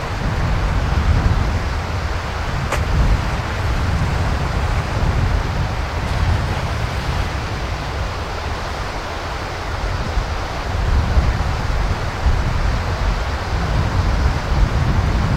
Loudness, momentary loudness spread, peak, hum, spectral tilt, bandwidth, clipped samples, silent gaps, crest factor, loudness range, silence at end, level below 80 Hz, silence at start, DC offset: -21 LUFS; 6 LU; -4 dBFS; none; -6 dB/octave; 14 kHz; under 0.1%; none; 16 dB; 4 LU; 0 s; -22 dBFS; 0 s; under 0.1%